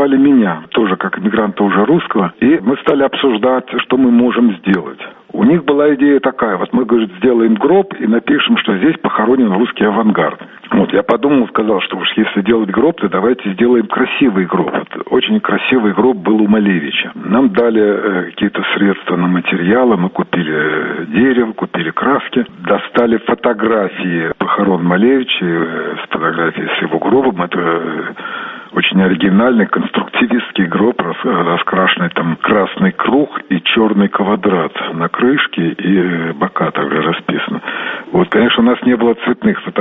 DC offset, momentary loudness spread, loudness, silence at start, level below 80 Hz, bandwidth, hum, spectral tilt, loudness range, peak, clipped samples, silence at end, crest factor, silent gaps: under 0.1%; 6 LU; -13 LUFS; 0 s; -52 dBFS; 4 kHz; none; -9.5 dB/octave; 2 LU; 0 dBFS; under 0.1%; 0 s; 12 dB; none